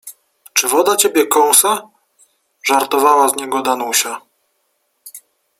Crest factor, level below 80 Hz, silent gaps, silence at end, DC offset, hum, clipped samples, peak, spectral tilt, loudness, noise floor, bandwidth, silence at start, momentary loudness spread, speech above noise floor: 16 dB; -66 dBFS; none; 0.4 s; under 0.1%; none; under 0.1%; 0 dBFS; -0.5 dB/octave; -14 LUFS; -66 dBFS; 16.5 kHz; 0.05 s; 10 LU; 52 dB